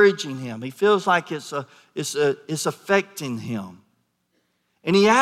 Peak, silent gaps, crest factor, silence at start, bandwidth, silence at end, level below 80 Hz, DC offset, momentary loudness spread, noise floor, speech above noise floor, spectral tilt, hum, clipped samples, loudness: -4 dBFS; none; 18 dB; 0 s; 15 kHz; 0 s; -74 dBFS; under 0.1%; 14 LU; -70 dBFS; 48 dB; -4.5 dB/octave; none; under 0.1%; -23 LUFS